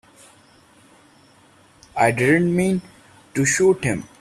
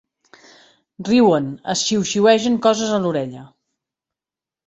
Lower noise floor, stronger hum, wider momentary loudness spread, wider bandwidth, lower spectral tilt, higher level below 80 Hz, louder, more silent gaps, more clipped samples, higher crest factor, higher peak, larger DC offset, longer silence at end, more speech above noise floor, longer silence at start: second, -53 dBFS vs -89 dBFS; neither; about the same, 10 LU vs 10 LU; first, 14 kHz vs 8.2 kHz; about the same, -5 dB/octave vs -4.5 dB/octave; first, -54 dBFS vs -60 dBFS; about the same, -19 LUFS vs -17 LUFS; neither; neither; about the same, 20 dB vs 18 dB; about the same, -4 dBFS vs -2 dBFS; neither; second, 0.15 s vs 1.2 s; second, 34 dB vs 72 dB; first, 1.95 s vs 1 s